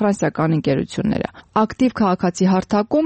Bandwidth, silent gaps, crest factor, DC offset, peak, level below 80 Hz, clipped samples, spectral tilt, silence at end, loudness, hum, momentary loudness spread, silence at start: 8.8 kHz; none; 12 dB; under 0.1%; -6 dBFS; -48 dBFS; under 0.1%; -7 dB/octave; 0 s; -19 LUFS; none; 5 LU; 0 s